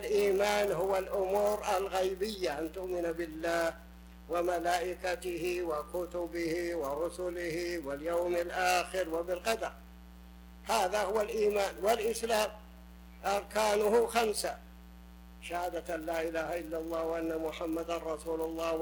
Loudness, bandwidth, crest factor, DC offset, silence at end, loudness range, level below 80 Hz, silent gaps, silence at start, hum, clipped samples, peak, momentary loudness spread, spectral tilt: -33 LUFS; 19.5 kHz; 20 dB; under 0.1%; 0 s; 4 LU; -54 dBFS; none; 0 s; none; under 0.1%; -14 dBFS; 8 LU; -3.5 dB/octave